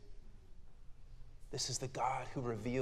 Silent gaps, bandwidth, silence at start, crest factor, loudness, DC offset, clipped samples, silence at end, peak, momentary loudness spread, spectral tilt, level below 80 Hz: none; 15 kHz; 0 s; 20 dB; -40 LUFS; under 0.1%; under 0.1%; 0 s; -22 dBFS; 23 LU; -4 dB/octave; -54 dBFS